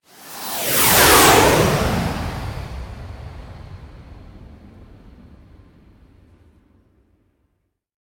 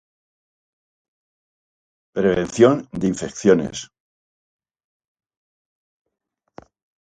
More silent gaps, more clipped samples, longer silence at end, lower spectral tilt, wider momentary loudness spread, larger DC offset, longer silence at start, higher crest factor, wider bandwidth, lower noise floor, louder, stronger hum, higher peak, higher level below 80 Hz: neither; neither; first, 3.65 s vs 3.15 s; second, -3 dB/octave vs -6 dB/octave; first, 28 LU vs 14 LU; neither; second, 0.25 s vs 2.15 s; about the same, 22 dB vs 24 dB; first, 19.5 kHz vs 9.4 kHz; first, -71 dBFS vs -47 dBFS; first, -14 LUFS vs -19 LUFS; neither; about the same, 0 dBFS vs 0 dBFS; first, -36 dBFS vs -54 dBFS